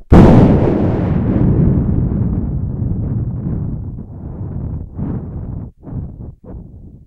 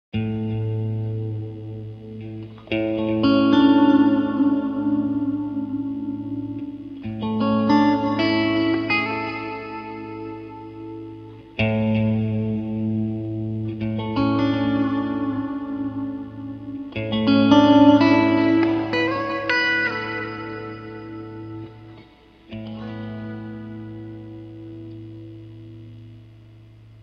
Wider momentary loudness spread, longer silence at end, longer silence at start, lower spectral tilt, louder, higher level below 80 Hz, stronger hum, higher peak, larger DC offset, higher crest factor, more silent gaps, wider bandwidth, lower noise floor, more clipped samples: about the same, 20 LU vs 21 LU; first, 0.15 s vs 0 s; second, 0 s vs 0.15 s; first, -10.5 dB/octave vs -7.5 dB/octave; first, -15 LUFS vs -21 LUFS; first, -24 dBFS vs -52 dBFS; neither; about the same, 0 dBFS vs -2 dBFS; neither; second, 14 dB vs 20 dB; neither; first, 7.6 kHz vs 6.2 kHz; second, -34 dBFS vs -49 dBFS; first, 0.3% vs under 0.1%